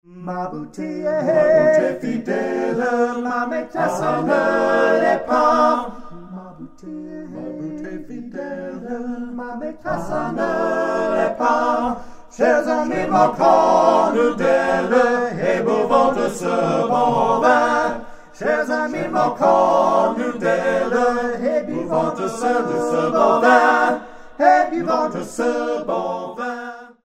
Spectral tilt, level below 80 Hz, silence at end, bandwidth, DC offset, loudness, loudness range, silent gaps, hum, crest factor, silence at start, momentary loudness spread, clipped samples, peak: -5.5 dB/octave; -50 dBFS; 0.15 s; 13 kHz; under 0.1%; -18 LUFS; 8 LU; none; none; 18 dB; 0.1 s; 15 LU; under 0.1%; 0 dBFS